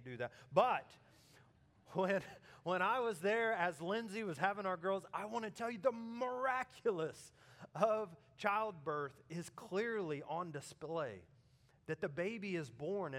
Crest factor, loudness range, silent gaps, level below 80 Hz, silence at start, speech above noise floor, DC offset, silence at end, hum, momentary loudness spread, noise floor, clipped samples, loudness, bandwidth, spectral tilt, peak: 24 dB; 5 LU; none; -82 dBFS; 0 s; 30 dB; under 0.1%; 0 s; none; 12 LU; -70 dBFS; under 0.1%; -40 LUFS; 16 kHz; -5.5 dB/octave; -18 dBFS